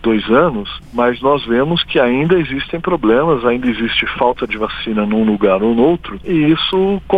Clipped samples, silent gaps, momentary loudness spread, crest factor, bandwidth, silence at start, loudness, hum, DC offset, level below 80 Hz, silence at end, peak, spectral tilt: under 0.1%; none; 7 LU; 14 dB; 5 kHz; 0 s; -15 LUFS; none; under 0.1%; -38 dBFS; 0 s; 0 dBFS; -8 dB/octave